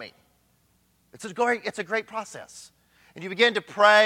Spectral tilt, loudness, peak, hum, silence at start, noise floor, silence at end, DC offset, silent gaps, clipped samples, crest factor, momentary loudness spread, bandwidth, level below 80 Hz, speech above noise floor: -2.5 dB/octave; -24 LUFS; -4 dBFS; none; 0 s; -66 dBFS; 0 s; under 0.1%; none; under 0.1%; 22 dB; 22 LU; 15 kHz; -74 dBFS; 42 dB